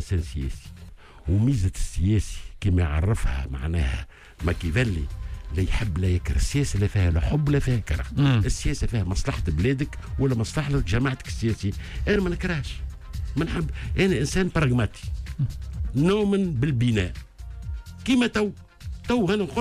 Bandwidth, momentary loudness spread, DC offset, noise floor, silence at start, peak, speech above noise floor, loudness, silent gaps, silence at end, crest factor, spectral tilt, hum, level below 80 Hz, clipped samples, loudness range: 14.5 kHz; 12 LU; under 0.1%; -44 dBFS; 0 s; -10 dBFS; 20 dB; -25 LUFS; none; 0 s; 14 dB; -6.5 dB/octave; none; -32 dBFS; under 0.1%; 3 LU